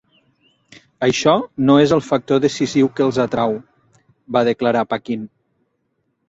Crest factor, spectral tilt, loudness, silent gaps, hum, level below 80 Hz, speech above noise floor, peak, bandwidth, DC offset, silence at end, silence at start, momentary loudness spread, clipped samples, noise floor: 18 dB; -5.5 dB/octave; -17 LUFS; none; none; -56 dBFS; 53 dB; -2 dBFS; 8 kHz; under 0.1%; 1.05 s; 1 s; 10 LU; under 0.1%; -69 dBFS